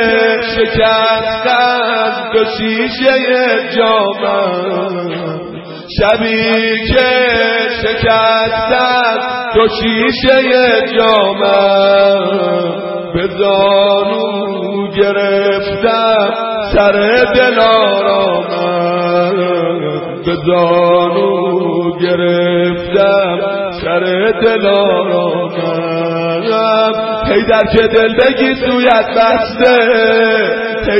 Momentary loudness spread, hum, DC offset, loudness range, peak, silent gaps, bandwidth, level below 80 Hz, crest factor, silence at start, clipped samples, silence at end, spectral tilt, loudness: 7 LU; none; under 0.1%; 3 LU; 0 dBFS; none; 5.8 kHz; -36 dBFS; 12 dB; 0 s; under 0.1%; 0 s; -7.5 dB/octave; -11 LUFS